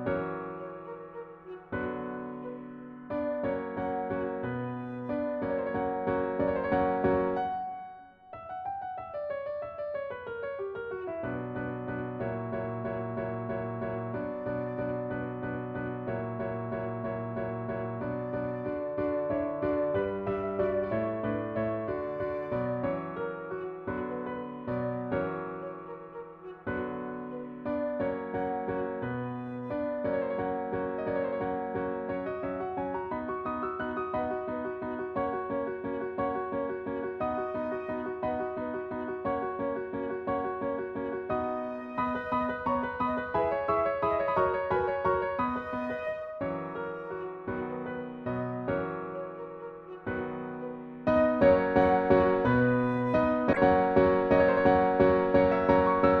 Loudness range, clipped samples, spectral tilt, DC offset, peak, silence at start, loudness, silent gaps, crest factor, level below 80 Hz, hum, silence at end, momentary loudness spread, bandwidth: 10 LU; under 0.1%; -9.5 dB/octave; under 0.1%; -10 dBFS; 0 s; -31 LUFS; none; 22 dB; -54 dBFS; none; 0 s; 14 LU; 5.6 kHz